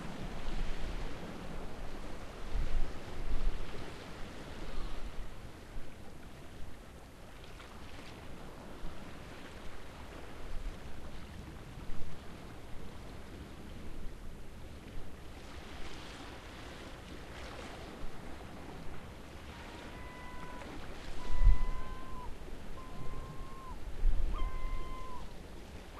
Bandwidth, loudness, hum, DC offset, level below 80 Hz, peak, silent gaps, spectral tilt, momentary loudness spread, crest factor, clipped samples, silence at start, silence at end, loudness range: 11 kHz; -46 LUFS; none; under 0.1%; -40 dBFS; -12 dBFS; none; -5.5 dB/octave; 10 LU; 22 dB; under 0.1%; 0 s; 0 s; 9 LU